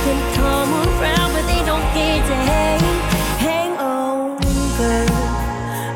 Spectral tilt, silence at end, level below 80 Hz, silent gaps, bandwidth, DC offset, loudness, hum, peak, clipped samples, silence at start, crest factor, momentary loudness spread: -5 dB/octave; 0 s; -24 dBFS; none; 17 kHz; under 0.1%; -18 LUFS; none; -6 dBFS; under 0.1%; 0 s; 12 dB; 4 LU